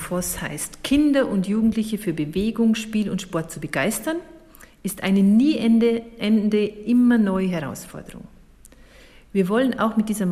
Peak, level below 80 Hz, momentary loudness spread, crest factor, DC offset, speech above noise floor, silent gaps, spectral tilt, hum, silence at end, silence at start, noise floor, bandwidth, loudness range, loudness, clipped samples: -8 dBFS; -48 dBFS; 11 LU; 14 dB; under 0.1%; 28 dB; none; -5.5 dB/octave; none; 0 s; 0 s; -48 dBFS; 15.5 kHz; 5 LU; -21 LUFS; under 0.1%